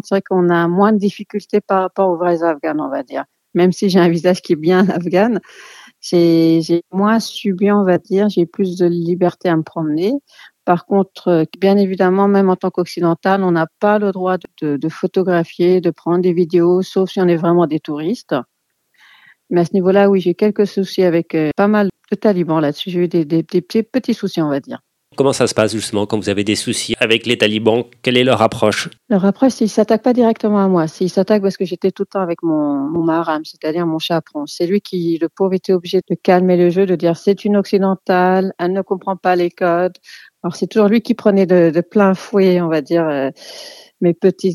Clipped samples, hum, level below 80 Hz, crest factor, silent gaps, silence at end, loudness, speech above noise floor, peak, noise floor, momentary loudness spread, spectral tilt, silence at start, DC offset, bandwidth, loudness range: under 0.1%; none; -62 dBFS; 16 dB; none; 0 s; -16 LUFS; 47 dB; 0 dBFS; -62 dBFS; 7 LU; -6.5 dB/octave; 0.05 s; under 0.1%; 13.5 kHz; 3 LU